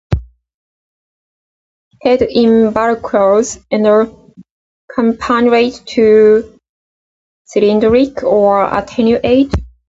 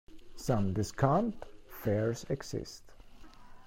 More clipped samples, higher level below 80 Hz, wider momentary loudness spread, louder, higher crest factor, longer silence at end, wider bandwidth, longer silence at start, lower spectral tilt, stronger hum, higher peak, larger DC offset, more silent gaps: neither; first, -34 dBFS vs -54 dBFS; second, 8 LU vs 19 LU; first, -12 LUFS vs -33 LUFS; second, 12 dB vs 22 dB; first, 0.25 s vs 0 s; second, 7.8 kHz vs 16 kHz; about the same, 0.1 s vs 0.1 s; about the same, -6 dB/octave vs -6.5 dB/octave; neither; first, 0 dBFS vs -12 dBFS; neither; first, 0.54-1.91 s, 4.51-4.88 s, 6.69-7.45 s vs none